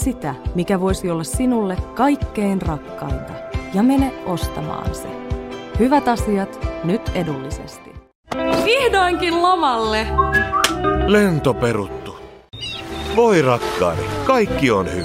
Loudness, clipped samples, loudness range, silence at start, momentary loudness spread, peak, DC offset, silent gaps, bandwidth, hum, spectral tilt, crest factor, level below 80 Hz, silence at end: -19 LUFS; under 0.1%; 5 LU; 0 s; 13 LU; 0 dBFS; under 0.1%; 8.15-8.23 s; 16 kHz; none; -5.5 dB/octave; 18 dB; -32 dBFS; 0 s